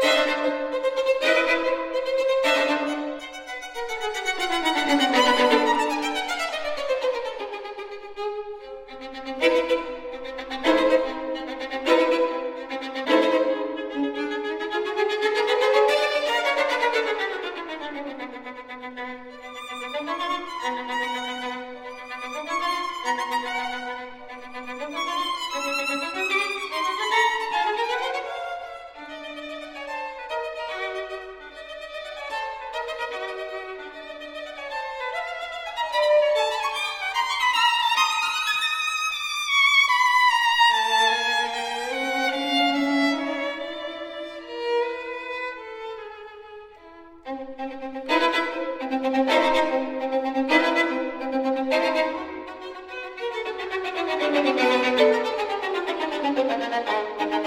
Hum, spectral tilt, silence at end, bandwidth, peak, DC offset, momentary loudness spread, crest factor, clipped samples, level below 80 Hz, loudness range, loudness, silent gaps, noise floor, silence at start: none; -1.5 dB/octave; 0 s; 16.5 kHz; -6 dBFS; under 0.1%; 16 LU; 20 dB; under 0.1%; -60 dBFS; 12 LU; -24 LUFS; none; -46 dBFS; 0 s